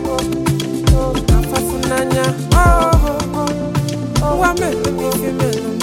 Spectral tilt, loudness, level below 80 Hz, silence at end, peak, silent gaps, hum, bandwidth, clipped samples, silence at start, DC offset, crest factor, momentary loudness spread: -5.5 dB/octave; -16 LUFS; -20 dBFS; 0 s; 0 dBFS; none; none; 17 kHz; under 0.1%; 0 s; under 0.1%; 14 dB; 6 LU